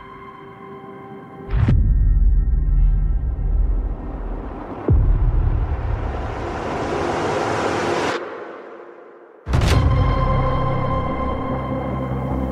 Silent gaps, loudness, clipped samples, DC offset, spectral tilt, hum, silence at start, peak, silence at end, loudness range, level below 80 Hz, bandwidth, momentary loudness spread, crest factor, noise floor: none; -22 LUFS; under 0.1%; under 0.1%; -7 dB/octave; none; 0 s; -4 dBFS; 0 s; 2 LU; -22 dBFS; 9.6 kHz; 19 LU; 14 dB; -43 dBFS